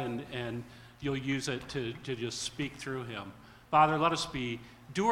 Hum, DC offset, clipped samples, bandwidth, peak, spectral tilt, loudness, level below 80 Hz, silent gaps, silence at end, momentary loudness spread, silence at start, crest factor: none; under 0.1%; under 0.1%; 16.5 kHz; -12 dBFS; -4.5 dB/octave; -33 LUFS; -58 dBFS; none; 0 s; 16 LU; 0 s; 22 dB